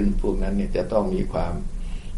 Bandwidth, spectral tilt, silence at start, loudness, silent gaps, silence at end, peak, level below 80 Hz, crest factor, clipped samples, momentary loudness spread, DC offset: 11.5 kHz; -8 dB/octave; 0 s; -26 LUFS; none; 0 s; -8 dBFS; -26 dBFS; 16 dB; under 0.1%; 10 LU; under 0.1%